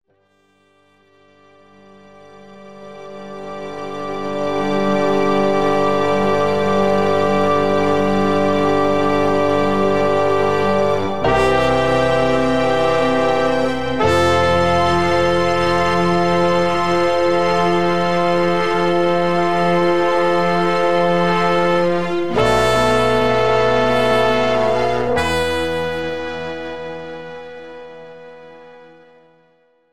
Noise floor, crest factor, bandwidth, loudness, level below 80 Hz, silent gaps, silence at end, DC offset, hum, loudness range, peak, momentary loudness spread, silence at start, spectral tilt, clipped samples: -59 dBFS; 14 dB; 15 kHz; -16 LUFS; -42 dBFS; none; 0 s; 4%; none; 10 LU; -2 dBFS; 12 LU; 0 s; -5.5 dB/octave; under 0.1%